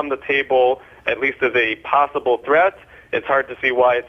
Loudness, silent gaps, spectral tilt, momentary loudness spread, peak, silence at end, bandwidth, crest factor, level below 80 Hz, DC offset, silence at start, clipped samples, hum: -18 LUFS; none; -6 dB/octave; 7 LU; -2 dBFS; 0 s; 6 kHz; 16 dB; -56 dBFS; under 0.1%; 0 s; under 0.1%; none